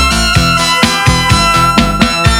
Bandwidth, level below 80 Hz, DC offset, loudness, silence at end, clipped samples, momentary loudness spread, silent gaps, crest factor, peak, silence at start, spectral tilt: 19.5 kHz; -20 dBFS; under 0.1%; -9 LUFS; 0 s; 0.3%; 2 LU; none; 10 dB; 0 dBFS; 0 s; -3.5 dB/octave